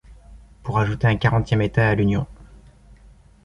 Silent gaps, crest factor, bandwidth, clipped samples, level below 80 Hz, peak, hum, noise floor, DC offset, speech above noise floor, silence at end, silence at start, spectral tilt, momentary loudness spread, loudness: none; 18 dB; 7.2 kHz; under 0.1%; -40 dBFS; -4 dBFS; none; -49 dBFS; under 0.1%; 30 dB; 1 s; 0.1 s; -8 dB/octave; 9 LU; -20 LUFS